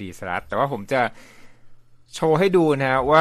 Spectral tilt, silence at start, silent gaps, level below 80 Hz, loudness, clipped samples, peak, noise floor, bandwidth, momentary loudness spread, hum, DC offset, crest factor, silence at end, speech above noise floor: -6 dB/octave; 0 s; none; -50 dBFS; -21 LUFS; under 0.1%; -2 dBFS; -44 dBFS; 14.5 kHz; 11 LU; none; under 0.1%; 20 dB; 0 s; 24 dB